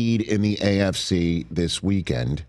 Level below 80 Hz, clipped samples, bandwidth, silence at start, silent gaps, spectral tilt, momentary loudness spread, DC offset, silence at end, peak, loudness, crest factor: -42 dBFS; under 0.1%; 12.5 kHz; 0 s; none; -5.5 dB/octave; 4 LU; under 0.1%; 0.05 s; -4 dBFS; -23 LUFS; 18 dB